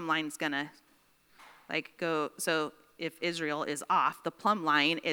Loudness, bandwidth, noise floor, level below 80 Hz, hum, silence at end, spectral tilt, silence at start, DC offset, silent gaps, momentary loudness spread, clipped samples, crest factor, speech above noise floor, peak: -31 LUFS; over 20 kHz; -66 dBFS; -82 dBFS; none; 0 s; -3 dB/octave; 0 s; under 0.1%; none; 10 LU; under 0.1%; 22 dB; 34 dB; -12 dBFS